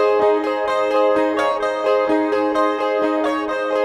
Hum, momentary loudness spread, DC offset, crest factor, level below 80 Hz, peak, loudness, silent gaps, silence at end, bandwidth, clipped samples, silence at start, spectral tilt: none; 3 LU; under 0.1%; 12 dB; -56 dBFS; -6 dBFS; -18 LUFS; none; 0 s; 11.5 kHz; under 0.1%; 0 s; -4.5 dB/octave